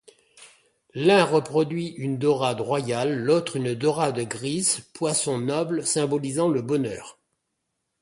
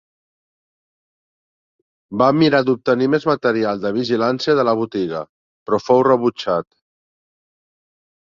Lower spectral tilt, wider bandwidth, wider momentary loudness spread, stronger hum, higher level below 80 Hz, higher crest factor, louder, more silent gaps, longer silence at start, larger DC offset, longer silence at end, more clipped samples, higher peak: second, -4.5 dB/octave vs -6.5 dB/octave; first, 11.5 kHz vs 7.4 kHz; about the same, 8 LU vs 10 LU; neither; second, -66 dBFS vs -60 dBFS; about the same, 20 dB vs 18 dB; second, -24 LUFS vs -17 LUFS; second, none vs 5.29-5.66 s; second, 0.4 s vs 2.1 s; neither; second, 0.9 s vs 1.65 s; neither; second, -6 dBFS vs -2 dBFS